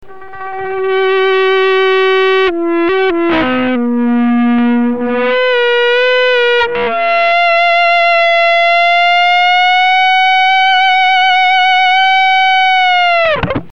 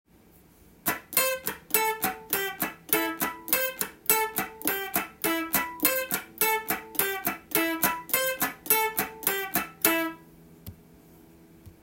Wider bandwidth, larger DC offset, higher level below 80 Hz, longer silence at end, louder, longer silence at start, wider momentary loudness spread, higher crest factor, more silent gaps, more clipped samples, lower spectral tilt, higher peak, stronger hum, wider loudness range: second, 7.8 kHz vs 17.5 kHz; first, 3% vs under 0.1%; first, -46 dBFS vs -62 dBFS; about the same, 0.1 s vs 0.1 s; first, -10 LUFS vs -26 LUFS; second, 0.1 s vs 0.85 s; about the same, 5 LU vs 7 LU; second, 10 dB vs 26 dB; neither; neither; first, -4.5 dB/octave vs -1.5 dB/octave; about the same, 0 dBFS vs -2 dBFS; neither; about the same, 4 LU vs 2 LU